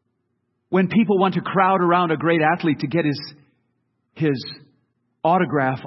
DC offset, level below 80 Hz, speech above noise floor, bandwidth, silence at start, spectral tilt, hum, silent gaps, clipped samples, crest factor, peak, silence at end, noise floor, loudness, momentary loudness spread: under 0.1%; -66 dBFS; 53 dB; 6 kHz; 0.7 s; -9 dB/octave; none; none; under 0.1%; 18 dB; -4 dBFS; 0 s; -72 dBFS; -20 LUFS; 8 LU